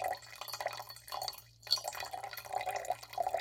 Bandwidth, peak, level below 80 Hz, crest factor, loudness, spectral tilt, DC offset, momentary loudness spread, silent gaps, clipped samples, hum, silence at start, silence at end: 17 kHz; -14 dBFS; -70 dBFS; 26 dB; -39 LUFS; -0.5 dB/octave; under 0.1%; 10 LU; none; under 0.1%; none; 0 s; 0 s